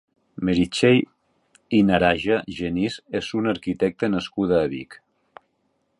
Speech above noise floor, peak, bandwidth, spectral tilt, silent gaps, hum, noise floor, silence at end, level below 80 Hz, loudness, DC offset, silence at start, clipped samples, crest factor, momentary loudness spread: 49 dB; -2 dBFS; 11 kHz; -6 dB/octave; none; none; -70 dBFS; 1.05 s; -48 dBFS; -22 LUFS; under 0.1%; 0.4 s; under 0.1%; 20 dB; 10 LU